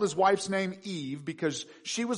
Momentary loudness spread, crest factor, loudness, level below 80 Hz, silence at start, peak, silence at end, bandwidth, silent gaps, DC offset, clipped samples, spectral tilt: 12 LU; 18 dB; -31 LUFS; -74 dBFS; 0 s; -12 dBFS; 0 s; 10.5 kHz; none; under 0.1%; under 0.1%; -4 dB/octave